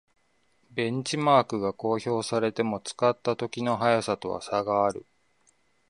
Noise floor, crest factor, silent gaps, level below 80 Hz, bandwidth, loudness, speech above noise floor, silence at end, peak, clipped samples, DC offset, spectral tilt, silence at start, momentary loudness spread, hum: -70 dBFS; 22 dB; none; -66 dBFS; 11.5 kHz; -27 LUFS; 43 dB; 0.85 s; -6 dBFS; under 0.1%; under 0.1%; -5 dB/octave; 0.75 s; 8 LU; none